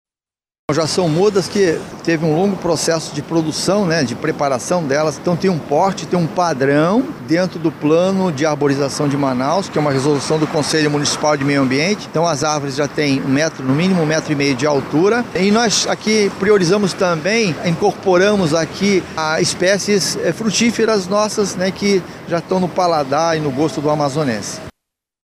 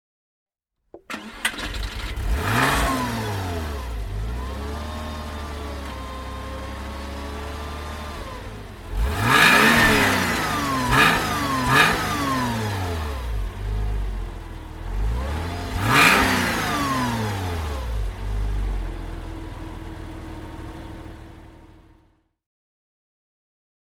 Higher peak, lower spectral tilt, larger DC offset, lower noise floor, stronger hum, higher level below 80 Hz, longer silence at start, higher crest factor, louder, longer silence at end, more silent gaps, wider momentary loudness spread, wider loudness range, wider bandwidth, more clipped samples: about the same, -2 dBFS vs 0 dBFS; about the same, -4.5 dB/octave vs -4 dB/octave; neither; first, under -90 dBFS vs -61 dBFS; neither; second, -52 dBFS vs -32 dBFS; second, 0.7 s vs 0.95 s; second, 14 dB vs 24 dB; first, -16 LUFS vs -22 LUFS; second, 0.55 s vs 2.15 s; neither; second, 5 LU vs 21 LU; second, 2 LU vs 16 LU; about the same, 15.5 kHz vs 17 kHz; neither